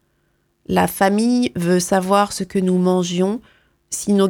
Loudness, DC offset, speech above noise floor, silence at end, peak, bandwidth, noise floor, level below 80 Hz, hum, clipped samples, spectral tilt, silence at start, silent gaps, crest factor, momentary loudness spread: -18 LUFS; under 0.1%; 48 dB; 0 s; 0 dBFS; 17.5 kHz; -65 dBFS; -52 dBFS; none; under 0.1%; -5.5 dB/octave; 0.7 s; none; 18 dB; 6 LU